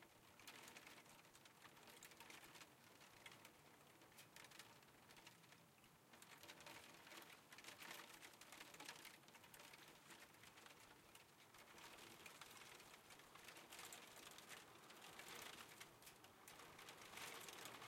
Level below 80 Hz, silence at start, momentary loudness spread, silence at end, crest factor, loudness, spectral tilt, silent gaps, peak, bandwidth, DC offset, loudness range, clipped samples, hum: under -90 dBFS; 0 s; 9 LU; 0 s; 26 dB; -61 LUFS; -1.5 dB/octave; none; -38 dBFS; 16.5 kHz; under 0.1%; 4 LU; under 0.1%; none